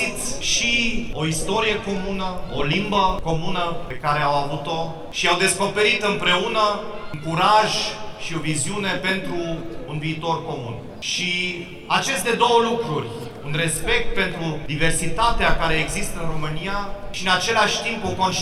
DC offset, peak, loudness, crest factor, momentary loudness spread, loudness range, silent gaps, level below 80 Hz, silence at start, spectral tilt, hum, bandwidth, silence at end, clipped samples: under 0.1%; -4 dBFS; -21 LUFS; 18 dB; 10 LU; 5 LU; none; -34 dBFS; 0 s; -3.5 dB/octave; none; 15 kHz; 0 s; under 0.1%